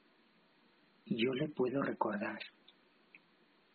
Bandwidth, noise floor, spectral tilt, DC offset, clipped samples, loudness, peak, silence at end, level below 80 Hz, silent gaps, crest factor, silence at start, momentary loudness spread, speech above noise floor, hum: 4.6 kHz; -70 dBFS; -4.5 dB/octave; under 0.1%; under 0.1%; -37 LUFS; -18 dBFS; 0.55 s; -82 dBFS; none; 22 dB; 1.05 s; 9 LU; 34 dB; none